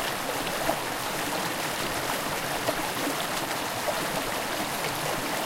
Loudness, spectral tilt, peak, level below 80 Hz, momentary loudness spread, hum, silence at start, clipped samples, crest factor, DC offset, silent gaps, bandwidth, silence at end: -28 LUFS; -2.5 dB/octave; -12 dBFS; -50 dBFS; 1 LU; none; 0 s; under 0.1%; 18 dB; under 0.1%; none; 17 kHz; 0 s